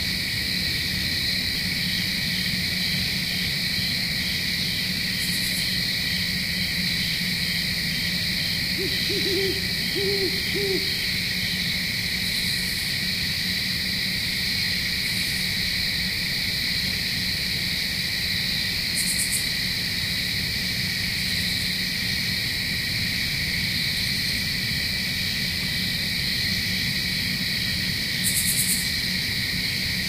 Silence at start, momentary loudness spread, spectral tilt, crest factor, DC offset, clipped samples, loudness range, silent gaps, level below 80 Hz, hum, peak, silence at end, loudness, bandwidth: 0 s; 2 LU; -2 dB/octave; 16 dB; under 0.1%; under 0.1%; 1 LU; none; -44 dBFS; none; -10 dBFS; 0 s; -23 LUFS; 16 kHz